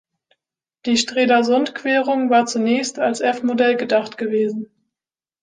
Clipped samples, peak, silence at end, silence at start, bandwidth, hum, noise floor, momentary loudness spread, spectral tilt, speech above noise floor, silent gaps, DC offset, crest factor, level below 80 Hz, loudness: under 0.1%; -4 dBFS; 0.75 s; 0.85 s; 9.8 kHz; none; under -90 dBFS; 7 LU; -3.5 dB/octave; over 72 dB; none; under 0.1%; 16 dB; -68 dBFS; -18 LUFS